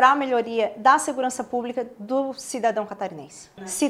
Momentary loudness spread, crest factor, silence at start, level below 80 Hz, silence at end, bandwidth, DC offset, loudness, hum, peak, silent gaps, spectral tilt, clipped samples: 14 LU; 20 dB; 0 s; -68 dBFS; 0 s; 15.5 kHz; under 0.1%; -24 LUFS; none; -2 dBFS; none; -3 dB/octave; under 0.1%